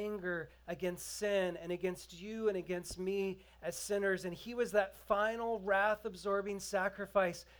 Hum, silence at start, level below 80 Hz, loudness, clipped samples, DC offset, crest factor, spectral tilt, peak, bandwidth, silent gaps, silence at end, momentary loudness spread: none; 0 s; -64 dBFS; -37 LUFS; under 0.1%; under 0.1%; 20 dB; -4 dB/octave; -18 dBFS; over 20 kHz; none; 0.05 s; 8 LU